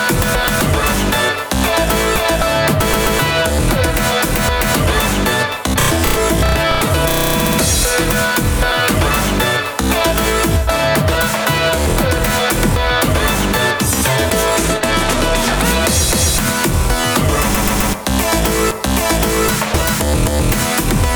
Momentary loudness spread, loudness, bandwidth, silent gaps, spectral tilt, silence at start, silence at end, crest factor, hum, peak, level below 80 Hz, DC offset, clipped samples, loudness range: 2 LU; -14 LUFS; over 20 kHz; none; -3.5 dB/octave; 0 s; 0 s; 14 dB; none; 0 dBFS; -22 dBFS; under 0.1%; under 0.1%; 1 LU